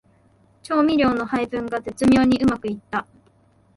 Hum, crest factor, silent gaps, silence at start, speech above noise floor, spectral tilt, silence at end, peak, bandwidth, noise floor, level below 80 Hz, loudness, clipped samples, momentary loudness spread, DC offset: none; 14 dB; none; 0.7 s; 38 dB; -6 dB/octave; 0.75 s; -6 dBFS; 11.5 kHz; -57 dBFS; -48 dBFS; -21 LUFS; under 0.1%; 12 LU; under 0.1%